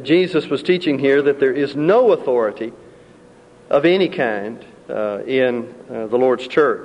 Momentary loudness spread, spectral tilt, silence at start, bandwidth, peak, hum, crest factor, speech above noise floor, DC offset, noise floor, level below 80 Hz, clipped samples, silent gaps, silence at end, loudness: 14 LU; -7 dB/octave; 0 s; 10 kHz; -4 dBFS; none; 14 dB; 29 dB; under 0.1%; -46 dBFS; -62 dBFS; under 0.1%; none; 0 s; -17 LUFS